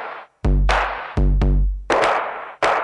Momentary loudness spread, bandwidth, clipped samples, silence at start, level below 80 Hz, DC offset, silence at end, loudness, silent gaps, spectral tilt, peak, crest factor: 7 LU; 10.5 kHz; under 0.1%; 0 s; -22 dBFS; under 0.1%; 0 s; -20 LUFS; none; -6 dB/octave; -4 dBFS; 14 dB